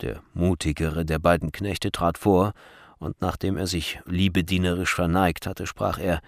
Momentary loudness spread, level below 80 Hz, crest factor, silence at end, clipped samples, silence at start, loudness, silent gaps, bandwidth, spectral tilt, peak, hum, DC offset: 8 LU; -40 dBFS; 18 dB; 0.05 s; under 0.1%; 0 s; -25 LUFS; none; 15.5 kHz; -5.5 dB/octave; -6 dBFS; none; under 0.1%